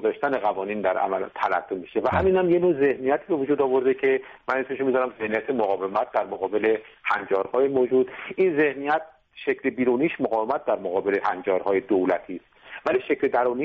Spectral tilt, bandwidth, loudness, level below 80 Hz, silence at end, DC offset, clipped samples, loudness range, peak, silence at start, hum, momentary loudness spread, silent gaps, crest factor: -4.5 dB/octave; 5.4 kHz; -24 LUFS; -56 dBFS; 0 s; under 0.1%; under 0.1%; 2 LU; -10 dBFS; 0 s; none; 6 LU; none; 14 dB